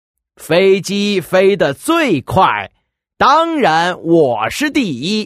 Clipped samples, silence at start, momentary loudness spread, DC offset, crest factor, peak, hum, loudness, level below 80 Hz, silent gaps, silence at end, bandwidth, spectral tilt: under 0.1%; 0.4 s; 5 LU; under 0.1%; 14 dB; 0 dBFS; none; -13 LUFS; -46 dBFS; none; 0 s; 15.5 kHz; -5 dB/octave